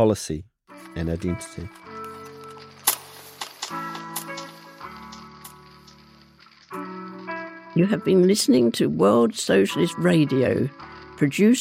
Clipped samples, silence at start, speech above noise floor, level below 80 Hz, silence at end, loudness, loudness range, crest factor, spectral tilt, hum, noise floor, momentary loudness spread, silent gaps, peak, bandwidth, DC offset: under 0.1%; 0 s; 32 dB; -52 dBFS; 0 s; -22 LUFS; 17 LU; 20 dB; -5 dB/octave; none; -52 dBFS; 22 LU; none; -2 dBFS; 16 kHz; under 0.1%